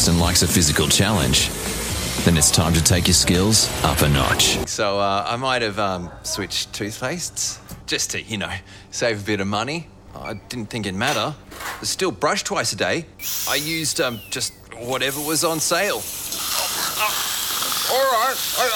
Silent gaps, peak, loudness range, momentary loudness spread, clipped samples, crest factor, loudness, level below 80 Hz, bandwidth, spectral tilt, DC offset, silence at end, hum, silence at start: none; -2 dBFS; 8 LU; 12 LU; under 0.1%; 20 dB; -20 LUFS; -38 dBFS; 20 kHz; -3 dB/octave; under 0.1%; 0 s; none; 0 s